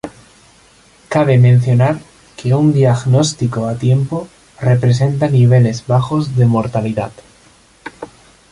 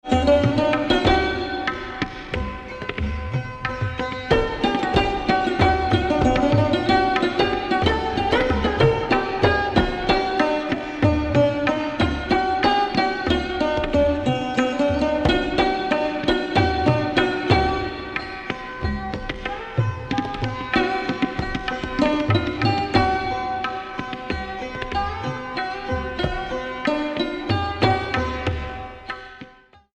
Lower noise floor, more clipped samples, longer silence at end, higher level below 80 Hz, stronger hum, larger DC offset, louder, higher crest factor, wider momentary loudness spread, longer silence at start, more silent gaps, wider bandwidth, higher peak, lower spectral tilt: about the same, -47 dBFS vs -49 dBFS; neither; about the same, 0.45 s vs 0.45 s; second, -46 dBFS vs -34 dBFS; neither; neither; first, -14 LUFS vs -22 LUFS; second, 12 dB vs 18 dB; first, 18 LU vs 10 LU; about the same, 0.05 s vs 0.05 s; neither; first, 11 kHz vs 9.8 kHz; about the same, -2 dBFS vs -4 dBFS; about the same, -7.5 dB/octave vs -6.5 dB/octave